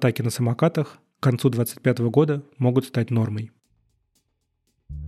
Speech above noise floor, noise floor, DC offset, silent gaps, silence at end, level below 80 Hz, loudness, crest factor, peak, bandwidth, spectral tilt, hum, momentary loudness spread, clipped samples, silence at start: 51 dB; -73 dBFS; under 0.1%; none; 0 s; -50 dBFS; -23 LUFS; 18 dB; -6 dBFS; 14.5 kHz; -7 dB/octave; none; 10 LU; under 0.1%; 0 s